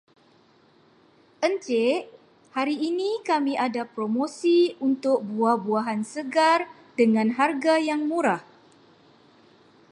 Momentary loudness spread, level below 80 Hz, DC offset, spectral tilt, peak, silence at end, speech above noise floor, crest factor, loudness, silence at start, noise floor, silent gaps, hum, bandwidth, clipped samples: 8 LU; -80 dBFS; under 0.1%; -5 dB/octave; -8 dBFS; 1.5 s; 35 dB; 18 dB; -24 LUFS; 1.4 s; -59 dBFS; none; none; 11 kHz; under 0.1%